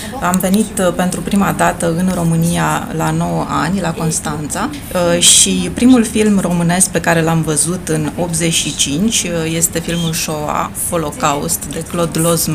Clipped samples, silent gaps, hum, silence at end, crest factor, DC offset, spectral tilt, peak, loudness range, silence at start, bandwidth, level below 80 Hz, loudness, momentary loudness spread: under 0.1%; none; none; 0 s; 14 dB; under 0.1%; -4 dB/octave; 0 dBFS; 5 LU; 0 s; 16 kHz; -36 dBFS; -14 LUFS; 7 LU